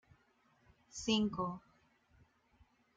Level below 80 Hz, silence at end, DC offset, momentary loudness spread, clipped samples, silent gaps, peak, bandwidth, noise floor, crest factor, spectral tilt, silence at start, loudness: -68 dBFS; 1.4 s; under 0.1%; 17 LU; under 0.1%; none; -22 dBFS; 9.2 kHz; -73 dBFS; 22 dB; -4.5 dB/octave; 0.95 s; -37 LUFS